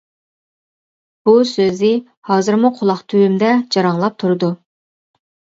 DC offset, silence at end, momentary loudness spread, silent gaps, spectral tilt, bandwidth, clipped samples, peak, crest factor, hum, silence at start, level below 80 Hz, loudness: under 0.1%; 0.95 s; 7 LU; 2.17-2.22 s; -6.5 dB/octave; 7.8 kHz; under 0.1%; 0 dBFS; 16 dB; none; 1.25 s; -64 dBFS; -15 LUFS